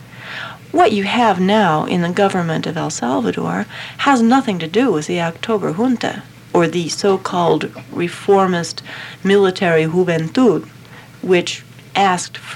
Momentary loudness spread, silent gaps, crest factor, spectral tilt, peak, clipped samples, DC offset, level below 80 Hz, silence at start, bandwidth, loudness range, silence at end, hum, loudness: 12 LU; none; 16 dB; -5.5 dB/octave; -2 dBFS; under 0.1%; under 0.1%; -58 dBFS; 0 s; 15.5 kHz; 2 LU; 0 s; none; -16 LUFS